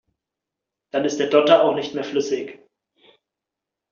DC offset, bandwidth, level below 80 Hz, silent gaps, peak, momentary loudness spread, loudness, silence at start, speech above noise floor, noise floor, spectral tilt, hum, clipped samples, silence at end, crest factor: under 0.1%; 7.4 kHz; -70 dBFS; none; -2 dBFS; 13 LU; -20 LUFS; 0.95 s; 66 dB; -85 dBFS; -3 dB/octave; none; under 0.1%; 1.35 s; 20 dB